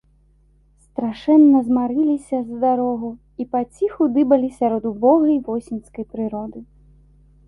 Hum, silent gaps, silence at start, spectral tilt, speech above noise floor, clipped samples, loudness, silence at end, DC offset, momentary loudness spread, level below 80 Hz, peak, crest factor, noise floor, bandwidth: none; none; 1 s; -8 dB/octave; 38 dB; under 0.1%; -19 LUFS; 0.85 s; under 0.1%; 17 LU; -54 dBFS; -2 dBFS; 16 dB; -56 dBFS; 11 kHz